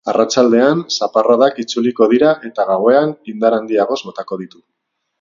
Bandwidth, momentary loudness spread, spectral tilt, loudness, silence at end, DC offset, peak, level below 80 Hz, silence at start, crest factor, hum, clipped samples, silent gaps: 7.6 kHz; 13 LU; -4.5 dB/octave; -14 LUFS; 0.75 s; under 0.1%; 0 dBFS; -62 dBFS; 0.05 s; 14 dB; none; under 0.1%; none